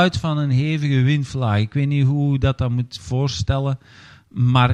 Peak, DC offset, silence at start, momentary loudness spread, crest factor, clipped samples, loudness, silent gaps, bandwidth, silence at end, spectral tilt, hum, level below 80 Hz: -2 dBFS; under 0.1%; 0 s; 7 LU; 16 dB; under 0.1%; -20 LUFS; none; 9 kHz; 0 s; -7 dB/octave; none; -40 dBFS